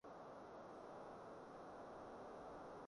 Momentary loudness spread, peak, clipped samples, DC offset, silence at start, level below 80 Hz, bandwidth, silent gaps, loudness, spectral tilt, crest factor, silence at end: 2 LU; -44 dBFS; under 0.1%; under 0.1%; 0.05 s; -78 dBFS; 11 kHz; none; -57 LUFS; -6 dB/octave; 12 dB; 0 s